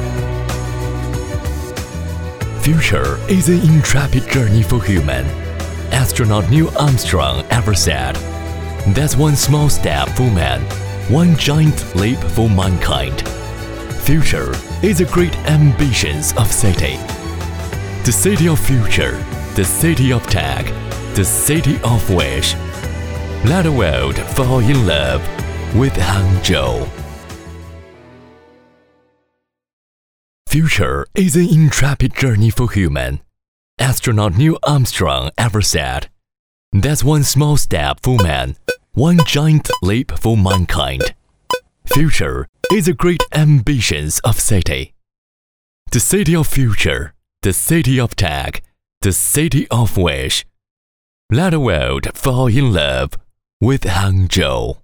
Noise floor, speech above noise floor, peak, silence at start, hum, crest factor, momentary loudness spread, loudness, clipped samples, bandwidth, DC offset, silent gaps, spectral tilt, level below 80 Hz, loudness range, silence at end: -71 dBFS; 58 dB; 0 dBFS; 0 s; none; 14 dB; 11 LU; -15 LUFS; under 0.1%; over 20 kHz; under 0.1%; 29.73-30.45 s, 33.48-33.77 s, 36.39-36.72 s, 42.49-42.53 s, 45.18-45.86 s, 48.97-49.01 s, 50.71-51.29 s, 53.53-53.60 s; -5 dB/octave; -26 dBFS; 3 LU; 0.05 s